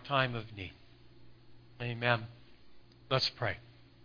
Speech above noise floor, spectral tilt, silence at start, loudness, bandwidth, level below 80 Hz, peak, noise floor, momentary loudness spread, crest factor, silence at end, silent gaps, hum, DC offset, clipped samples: 23 dB; -5.5 dB/octave; 0 s; -34 LUFS; 5.2 kHz; -64 dBFS; -12 dBFS; -57 dBFS; 15 LU; 24 dB; 0 s; none; 60 Hz at -55 dBFS; under 0.1%; under 0.1%